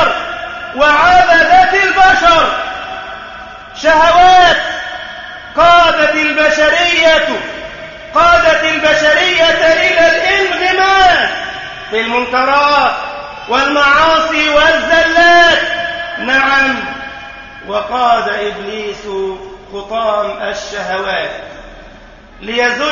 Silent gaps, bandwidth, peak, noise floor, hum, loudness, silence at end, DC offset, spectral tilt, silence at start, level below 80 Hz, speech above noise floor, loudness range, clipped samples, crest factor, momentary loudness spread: none; 7.4 kHz; 0 dBFS; -36 dBFS; none; -10 LUFS; 0 s; under 0.1%; -2.5 dB/octave; 0 s; -38 dBFS; 25 dB; 9 LU; under 0.1%; 12 dB; 18 LU